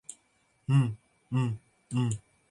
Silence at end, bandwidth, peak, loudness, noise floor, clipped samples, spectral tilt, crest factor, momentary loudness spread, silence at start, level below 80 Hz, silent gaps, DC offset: 0.3 s; 11 kHz; -14 dBFS; -31 LUFS; -70 dBFS; under 0.1%; -7 dB/octave; 18 dB; 17 LU; 0.1 s; -64 dBFS; none; under 0.1%